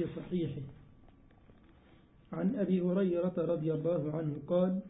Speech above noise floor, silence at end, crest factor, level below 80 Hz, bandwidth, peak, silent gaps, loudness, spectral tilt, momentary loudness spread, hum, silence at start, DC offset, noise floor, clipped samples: 29 dB; 0 s; 16 dB; -64 dBFS; 3.9 kHz; -20 dBFS; none; -33 LUFS; -9 dB/octave; 8 LU; none; 0 s; under 0.1%; -61 dBFS; under 0.1%